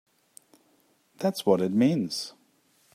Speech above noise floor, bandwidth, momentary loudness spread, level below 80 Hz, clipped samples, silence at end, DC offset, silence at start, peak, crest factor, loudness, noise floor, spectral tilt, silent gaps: 41 dB; 15.5 kHz; 10 LU; -74 dBFS; under 0.1%; 0.65 s; under 0.1%; 1.2 s; -8 dBFS; 22 dB; -26 LUFS; -66 dBFS; -6 dB/octave; none